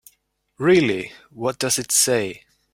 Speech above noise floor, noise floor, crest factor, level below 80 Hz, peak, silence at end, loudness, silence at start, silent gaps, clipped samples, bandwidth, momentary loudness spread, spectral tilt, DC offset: 46 dB; -67 dBFS; 18 dB; -58 dBFS; -4 dBFS; 0.35 s; -19 LUFS; 0.6 s; none; under 0.1%; 16.5 kHz; 12 LU; -3 dB/octave; under 0.1%